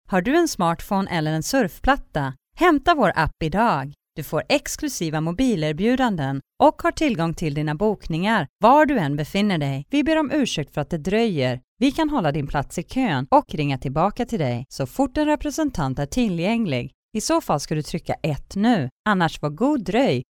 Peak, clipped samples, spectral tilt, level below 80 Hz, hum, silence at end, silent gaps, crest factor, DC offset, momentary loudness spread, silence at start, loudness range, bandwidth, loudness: -4 dBFS; under 0.1%; -5.5 dB/octave; -40 dBFS; none; 0.1 s; 8.49-8.56 s, 11.64-11.77 s, 16.94-17.09 s, 18.92-19.04 s; 18 dB; under 0.1%; 8 LU; 0.1 s; 3 LU; 19.5 kHz; -22 LUFS